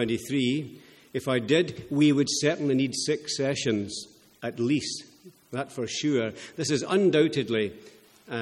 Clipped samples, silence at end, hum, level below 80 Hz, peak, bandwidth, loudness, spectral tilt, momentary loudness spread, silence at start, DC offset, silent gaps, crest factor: under 0.1%; 0 s; none; -66 dBFS; -8 dBFS; 14 kHz; -27 LUFS; -4.5 dB/octave; 14 LU; 0 s; under 0.1%; none; 18 dB